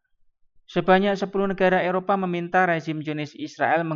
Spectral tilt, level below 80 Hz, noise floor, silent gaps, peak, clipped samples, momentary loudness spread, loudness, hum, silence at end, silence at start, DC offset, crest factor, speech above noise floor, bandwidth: -7 dB/octave; -58 dBFS; -61 dBFS; none; -6 dBFS; under 0.1%; 10 LU; -23 LUFS; none; 0 s; 0.7 s; under 0.1%; 18 dB; 39 dB; 7.4 kHz